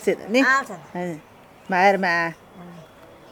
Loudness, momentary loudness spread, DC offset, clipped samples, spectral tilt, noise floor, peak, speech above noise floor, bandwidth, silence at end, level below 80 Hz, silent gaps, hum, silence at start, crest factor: -21 LUFS; 23 LU; under 0.1%; under 0.1%; -4.5 dB/octave; -46 dBFS; -6 dBFS; 25 dB; 19 kHz; 0.45 s; -64 dBFS; none; none; 0 s; 18 dB